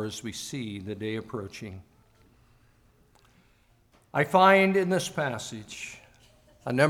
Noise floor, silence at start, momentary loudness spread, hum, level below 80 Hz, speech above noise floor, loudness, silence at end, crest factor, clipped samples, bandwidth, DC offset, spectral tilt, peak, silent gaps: -63 dBFS; 0 s; 22 LU; none; -64 dBFS; 36 dB; -26 LUFS; 0 s; 22 dB; under 0.1%; 17 kHz; under 0.1%; -5 dB/octave; -6 dBFS; none